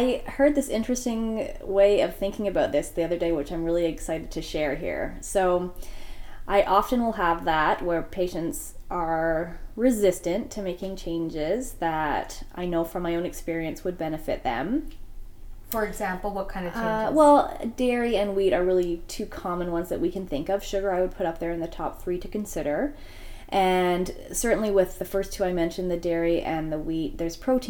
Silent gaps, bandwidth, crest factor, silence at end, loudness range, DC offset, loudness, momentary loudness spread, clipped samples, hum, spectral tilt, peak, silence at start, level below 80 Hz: none; 18 kHz; 20 dB; 0 s; 6 LU; under 0.1%; -26 LUFS; 10 LU; under 0.1%; none; -5 dB/octave; -6 dBFS; 0 s; -40 dBFS